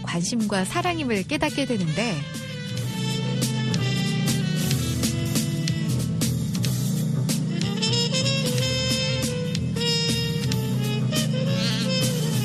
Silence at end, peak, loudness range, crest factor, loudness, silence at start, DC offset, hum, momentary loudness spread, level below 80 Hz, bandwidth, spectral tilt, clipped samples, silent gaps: 0 s; -8 dBFS; 2 LU; 16 dB; -24 LUFS; 0 s; under 0.1%; none; 4 LU; -48 dBFS; 14.5 kHz; -4.5 dB/octave; under 0.1%; none